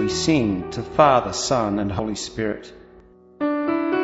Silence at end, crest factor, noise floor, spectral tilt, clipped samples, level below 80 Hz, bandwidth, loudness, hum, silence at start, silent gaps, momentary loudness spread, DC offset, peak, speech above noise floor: 0 s; 20 dB; -49 dBFS; -5 dB/octave; under 0.1%; -46 dBFS; 8 kHz; -21 LUFS; none; 0 s; none; 11 LU; under 0.1%; -2 dBFS; 28 dB